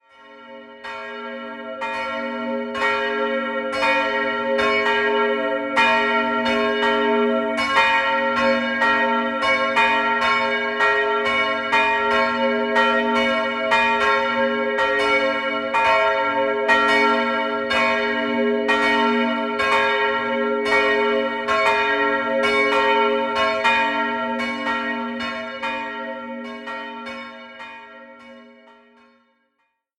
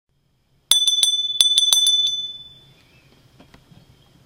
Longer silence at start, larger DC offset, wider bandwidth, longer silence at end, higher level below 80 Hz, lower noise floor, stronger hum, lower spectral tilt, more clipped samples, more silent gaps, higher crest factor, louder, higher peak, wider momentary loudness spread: second, 0.25 s vs 0.7 s; neither; second, 12 kHz vs 16.5 kHz; second, 1.55 s vs 1.8 s; first, -56 dBFS vs -64 dBFS; first, -71 dBFS vs -64 dBFS; neither; first, -3.5 dB/octave vs 3 dB/octave; neither; neither; about the same, 18 dB vs 22 dB; second, -19 LUFS vs -15 LUFS; about the same, -2 dBFS vs 0 dBFS; about the same, 13 LU vs 13 LU